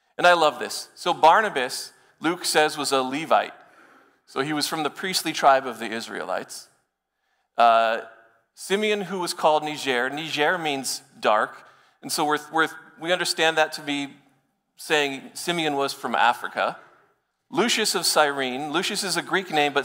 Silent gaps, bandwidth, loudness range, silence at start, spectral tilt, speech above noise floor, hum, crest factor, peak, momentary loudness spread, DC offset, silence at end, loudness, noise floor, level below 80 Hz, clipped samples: none; 16 kHz; 3 LU; 0.2 s; -2.5 dB/octave; 52 dB; none; 18 dB; -6 dBFS; 12 LU; under 0.1%; 0 s; -23 LUFS; -76 dBFS; -76 dBFS; under 0.1%